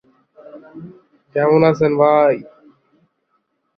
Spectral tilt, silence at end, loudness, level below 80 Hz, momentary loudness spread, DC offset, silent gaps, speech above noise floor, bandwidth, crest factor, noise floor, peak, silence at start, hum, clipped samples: -8.5 dB/octave; 1.35 s; -15 LUFS; -60 dBFS; 25 LU; under 0.1%; none; 53 dB; 6.4 kHz; 18 dB; -68 dBFS; -2 dBFS; 0.55 s; none; under 0.1%